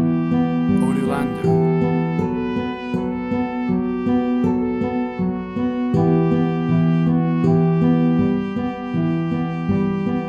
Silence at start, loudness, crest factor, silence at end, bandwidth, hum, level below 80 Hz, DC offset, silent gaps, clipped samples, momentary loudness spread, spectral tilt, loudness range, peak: 0 s; -20 LUFS; 14 dB; 0 s; 9.6 kHz; none; -46 dBFS; under 0.1%; none; under 0.1%; 7 LU; -9.5 dB/octave; 3 LU; -6 dBFS